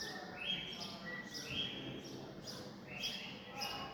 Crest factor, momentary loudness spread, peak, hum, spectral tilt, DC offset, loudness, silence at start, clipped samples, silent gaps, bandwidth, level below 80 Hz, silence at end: 18 dB; 8 LU; -28 dBFS; none; -3 dB/octave; under 0.1%; -43 LUFS; 0 s; under 0.1%; none; over 20 kHz; -70 dBFS; 0 s